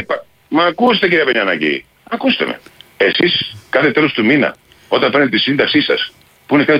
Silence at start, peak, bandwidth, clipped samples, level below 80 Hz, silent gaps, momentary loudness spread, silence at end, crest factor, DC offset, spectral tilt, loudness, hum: 0 s; 0 dBFS; 15 kHz; under 0.1%; -56 dBFS; none; 9 LU; 0 s; 14 dB; under 0.1%; -6.5 dB/octave; -14 LUFS; none